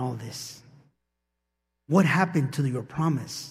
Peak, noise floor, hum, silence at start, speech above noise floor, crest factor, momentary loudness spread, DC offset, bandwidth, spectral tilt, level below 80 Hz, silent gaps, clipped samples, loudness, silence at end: -6 dBFS; -81 dBFS; none; 0 s; 55 dB; 22 dB; 15 LU; under 0.1%; 15 kHz; -6 dB/octave; -66 dBFS; none; under 0.1%; -26 LUFS; 0 s